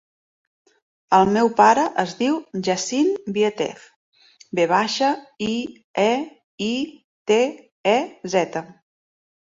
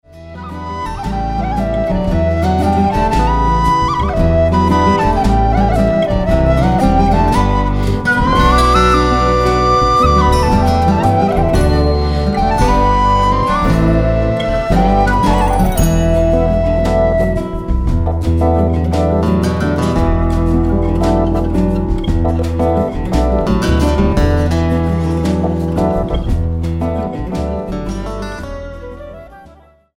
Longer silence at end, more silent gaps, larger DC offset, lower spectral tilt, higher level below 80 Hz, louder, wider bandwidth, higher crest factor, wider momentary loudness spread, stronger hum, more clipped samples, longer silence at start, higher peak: first, 0.75 s vs 0.55 s; first, 3.96-4.12 s, 5.84-5.94 s, 6.44-6.58 s, 7.04-7.25 s, 7.72-7.84 s vs none; neither; second, -4.5 dB/octave vs -7 dB/octave; second, -62 dBFS vs -18 dBFS; second, -21 LUFS vs -14 LUFS; second, 7.8 kHz vs 15.5 kHz; first, 20 dB vs 12 dB; first, 13 LU vs 8 LU; neither; neither; first, 1.1 s vs 0.15 s; about the same, -2 dBFS vs 0 dBFS